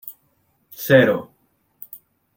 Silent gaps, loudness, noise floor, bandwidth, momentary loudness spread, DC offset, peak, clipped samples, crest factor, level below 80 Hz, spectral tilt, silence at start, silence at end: none; -17 LUFS; -65 dBFS; 17 kHz; 26 LU; under 0.1%; -2 dBFS; under 0.1%; 20 dB; -64 dBFS; -6 dB/octave; 0.05 s; 0.4 s